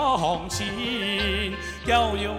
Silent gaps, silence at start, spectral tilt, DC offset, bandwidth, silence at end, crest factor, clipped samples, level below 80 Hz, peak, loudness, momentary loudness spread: none; 0 s; -4 dB/octave; under 0.1%; 16 kHz; 0 s; 16 dB; under 0.1%; -38 dBFS; -10 dBFS; -25 LUFS; 7 LU